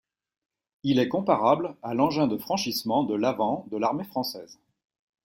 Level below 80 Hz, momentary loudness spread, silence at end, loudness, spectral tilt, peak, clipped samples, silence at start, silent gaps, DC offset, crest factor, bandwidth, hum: -66 dBFS; 8 LU; 0.7 s; -26 LUFS; -5.5 dB/octave; -8 dBFS; under 0.1%; 0.85 s; none; under 0.1%; 20 dB; 16.5 kHz; none